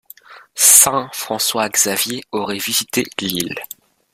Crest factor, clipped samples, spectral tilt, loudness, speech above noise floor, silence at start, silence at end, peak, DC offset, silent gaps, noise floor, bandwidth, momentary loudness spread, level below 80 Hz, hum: 18 dB; under 0.1%; -1 dB/octave; -15 LUFS; 25 dB; 0.3 s; 0.5 s; 0 dBFS; under 0.1%; none; -42 dBFS; over 20 kHz; 16 LU; -58 dBFS; none